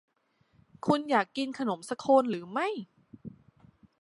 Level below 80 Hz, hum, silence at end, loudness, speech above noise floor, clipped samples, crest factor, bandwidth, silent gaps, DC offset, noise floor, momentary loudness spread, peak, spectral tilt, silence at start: -72 dBFS; none; 0.7 s; -29 LUFS; 42 dB; under 0.1%; 22 dB; 11.5 kHz; none; under 0.1%; -70 dBFS; 24 LU; -10 dBFS; -5.5 dB/octave; 0.85 s